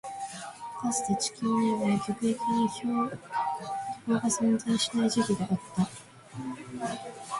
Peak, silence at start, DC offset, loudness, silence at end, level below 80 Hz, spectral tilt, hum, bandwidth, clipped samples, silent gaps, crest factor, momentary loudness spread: -14 dBFS; 0.05 s; under 0.1%; -30 LUFS; 0 s; -66 dBFS; -4.5 dB/octave; none; 11.5 kHz; under 0.1%; none; 16 dB; 13 LU